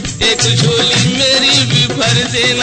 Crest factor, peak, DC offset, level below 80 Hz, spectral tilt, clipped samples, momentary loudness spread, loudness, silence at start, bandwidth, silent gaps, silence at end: 12 dB; 0 dBFS; under 0.1%; -36 dBFS; -3 dB/octave; under 0.1%; 3 LU; -10 LUFS; 0 s; 9.4 kHz; none; 0 s